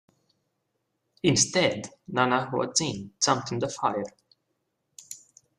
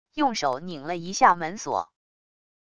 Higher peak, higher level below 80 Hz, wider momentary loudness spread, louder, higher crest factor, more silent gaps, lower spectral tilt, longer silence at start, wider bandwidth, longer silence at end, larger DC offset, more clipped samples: second, -8 dBFS vs -4 dBFS; about the same, -64 dBFS vs -62 dBFS; first, 19 LU vs 13 LU; about the same, -26 LUFS vs -25 LUFS; about the same, 22 dB vs 22 dB; neither; about the same, -3 dB/octave vs -3.5 dB/octave; first, 1.25 s vs 0.05 s; first, 14.5 kHz vs 11 kHz; second, 0.4 s vs 0.65 s; neither; neither